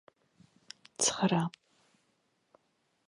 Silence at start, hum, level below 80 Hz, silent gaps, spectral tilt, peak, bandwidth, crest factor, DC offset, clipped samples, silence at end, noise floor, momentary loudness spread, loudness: 1 s; none; -76 dBFS; none; -3.5 dB/octave; -14 dBFS; 11.5 kHz; 22 dB; under 0.1%; under 0.1%; 1.6 s; -76 dBFS; 24 LU; -30 LUFS